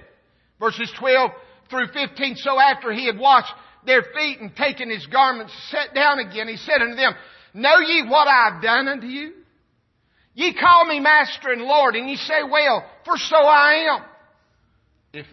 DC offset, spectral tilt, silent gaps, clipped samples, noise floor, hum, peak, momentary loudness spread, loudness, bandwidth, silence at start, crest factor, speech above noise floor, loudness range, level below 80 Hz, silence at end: under 0.1%; -3 dB/octave; none; under 0.1%; -66 dBFS; none; -2 dBFS; 12 LU; -18 LUFS; 6.2 kHz; 0.6 s; 18 dB; 47 dB; 4 LU; -64 dBFS; 0.1 s